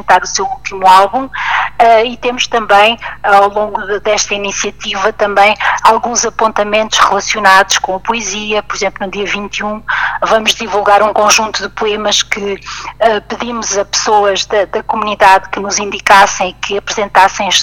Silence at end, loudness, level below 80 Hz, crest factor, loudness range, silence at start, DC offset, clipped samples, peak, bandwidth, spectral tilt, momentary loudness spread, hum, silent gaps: 0 s; -11 LUFS; -40 dBFS; 12 dB; 3 LU; 0.05 s; 1%; 0.3%; 0 dBFS; 19.5 kHz; -1.5 dB/octave; 9 LU; 50 Hz at -40 dBFS; none